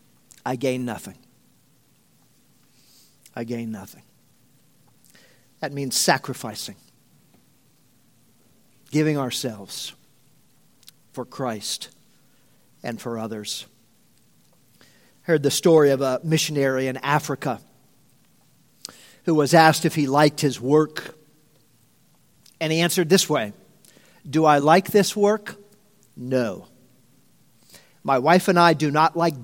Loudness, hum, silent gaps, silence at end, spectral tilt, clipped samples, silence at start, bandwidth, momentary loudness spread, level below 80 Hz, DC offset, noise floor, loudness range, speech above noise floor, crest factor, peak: -21 LUFS; none; none; 0 s; -4.5 dB/octave; under 0.1%; 0.45 s; 17 kHz; 19 LU; -70 dBFS; under 0.1%; -61 dBFS; 15 LU; 40 dB; 24 dB; 0 dBFS